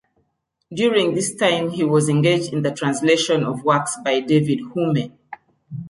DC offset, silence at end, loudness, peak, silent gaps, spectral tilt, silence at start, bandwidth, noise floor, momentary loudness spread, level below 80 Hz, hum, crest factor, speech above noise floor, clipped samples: under 0.1%; 0 s; -19 LUFS; -4 dBFS; none; -5 dB/octave; 0.7 s; 11.5 kHz; -71 dBFS; 6 LU; -62 dBFS; none; 16 dB; 52 dB; under 0.1%